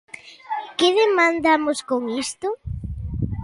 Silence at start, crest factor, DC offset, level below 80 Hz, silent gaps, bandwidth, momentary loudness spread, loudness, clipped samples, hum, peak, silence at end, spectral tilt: 0.15 s; 16 dB; under 0.1%; -38 dBFS; none; 11.5 kHz; 15 LU; -21 LUFS; under 0.1%; none; -6 dBFS; 0 s; -4.5 dB/octave